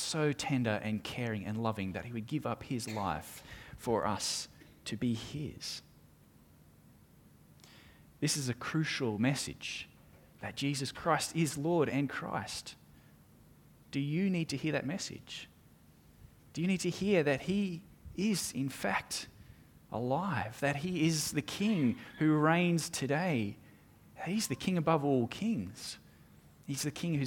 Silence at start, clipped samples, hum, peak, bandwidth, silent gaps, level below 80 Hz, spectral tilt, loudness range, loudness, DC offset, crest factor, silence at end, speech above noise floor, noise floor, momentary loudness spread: 0 s; under 0.1%; none; -14 dBFS; 18.5 kHz; none; -64 dBFS; -5 dB/octave; 6 LU; -34 LUFS; under 0.1%; 22 dB; 0 s; 28 dB; -61 dBFS; 13 LU